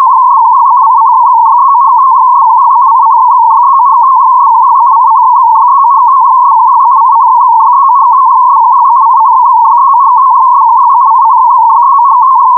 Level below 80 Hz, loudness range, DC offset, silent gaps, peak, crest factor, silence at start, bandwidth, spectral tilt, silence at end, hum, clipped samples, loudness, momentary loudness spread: under -90 dBFS; 0 LU; under 0.1%; none; 0 dBFS; 4 dB; 0 s; 1.3 kHz; -1.5 dB/octave; 0 s; none; 0.2%; -4 LUFS; 0 LU